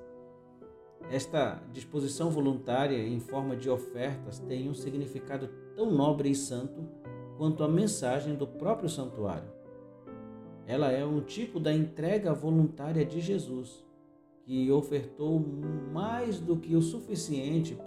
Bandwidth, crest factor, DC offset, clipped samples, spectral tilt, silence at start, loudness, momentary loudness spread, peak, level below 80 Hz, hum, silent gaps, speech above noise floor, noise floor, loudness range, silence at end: 13.5 kHz; 16 dB; under 0.1%; under 0.1%; -6.5 dB/octave; 0 s; -32 LUFS; 16 LU; -16 dBFS; -66 dBFS; none; none; 28 dB; -59 dBFS; 3 LU; 0 s